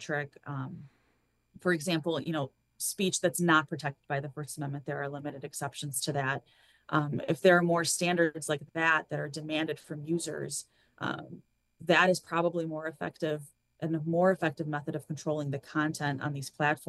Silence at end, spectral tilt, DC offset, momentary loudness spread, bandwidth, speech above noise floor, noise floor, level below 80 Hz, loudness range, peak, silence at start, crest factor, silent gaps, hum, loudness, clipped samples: 0.05 s; -4.5 dB/octave; under 0.1%; 13 LU; 12.5 kHz; 42 dB; -73 dBFS; -74 dBFS; 5 LU; -10 dBFS; 0 s; 22 dB; none; none; -31 LUFS; under 0.1%